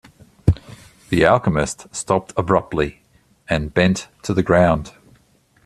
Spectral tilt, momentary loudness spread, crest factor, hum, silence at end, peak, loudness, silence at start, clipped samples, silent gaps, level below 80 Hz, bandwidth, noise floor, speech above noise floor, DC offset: -6 dB/octave; 10 LU; 20 dB; none; 0.75 s; 0 dBFS; -19 LUFS; 0.45 s; under 0.1%; none; -38 dBFS; 13 kHz; -57 dBFS; 39 dB; under 0.1%